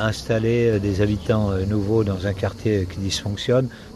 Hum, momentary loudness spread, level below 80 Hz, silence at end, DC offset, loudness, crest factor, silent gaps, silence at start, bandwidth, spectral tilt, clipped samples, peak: none; 5 LU; -42 dBFS; 0 s; under 0.1%; -22 LUFS; 14 dB; none; 0 s; 12.5 kHz; -6.5 dB/octave; under 0.1%; -6 dBFS